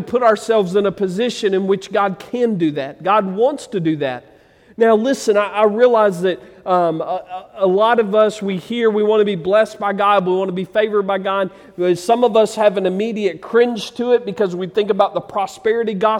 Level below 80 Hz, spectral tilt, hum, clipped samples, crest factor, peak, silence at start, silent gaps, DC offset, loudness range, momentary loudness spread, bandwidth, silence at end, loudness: -62 dBFS; -5.5 dB/octave; none; under 0.1%; 14 dB; -2 dBFS; 0 s; none; under 0.1%; 2 LU; 8 LU; 14 kHz; 0 s; -17 LUFS